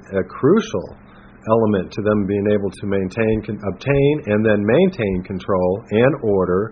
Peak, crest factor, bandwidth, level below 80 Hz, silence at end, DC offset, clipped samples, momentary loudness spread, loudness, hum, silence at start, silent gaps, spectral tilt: 0 dBFS; 18 dB; 6.8 kHz; -44 dBFS; 0 s; under 0.1%; under 0.1%; 9 LU; -19 LUFS; none; 0.1 s; none; -7 dB/octave